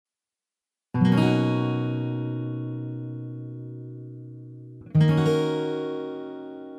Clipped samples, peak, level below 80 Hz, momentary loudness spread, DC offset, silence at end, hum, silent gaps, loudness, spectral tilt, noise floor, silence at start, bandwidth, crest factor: under 0.1%; -8 dBFS; -62 dBFS; 20 LU; under 0.1%; 0 s; none; none; -25 LUFS; -8 dB/octave; -90 dBFS; 0.95 s; 10.5 kHz; 18 dB